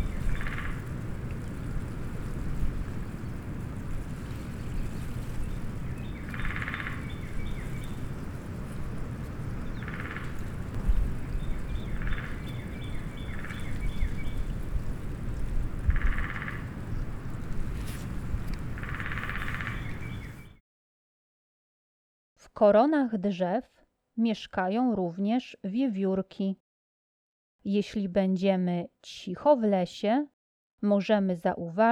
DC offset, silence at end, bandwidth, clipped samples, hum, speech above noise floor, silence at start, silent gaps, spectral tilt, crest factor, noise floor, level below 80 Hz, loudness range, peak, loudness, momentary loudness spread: under 0.1%; 0 s; 19 kHz; under 0.1%; none; over 63 dB; 0 s; 20.60-22.36 s, 26.60-27.59 s, 30.33-30.78 s; -7.5 dB/octave; 18 dB; under -90 dBFS; -36 dBFS; 10 LU; -12 dBFS; -32 LUFS; 12 LU